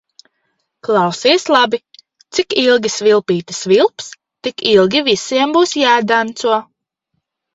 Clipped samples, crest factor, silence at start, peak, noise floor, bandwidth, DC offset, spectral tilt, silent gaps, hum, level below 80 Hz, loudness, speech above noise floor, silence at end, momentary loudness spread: under 0.1%; 16 dB; 0.9 s; 0 dBFS; -72 dBFS; 8 kHz; under 0.1%; -3.5 dB/octave; none; none; -58 dBFS; -14 LUFS; 58 dB; 0.9 s; 10 LU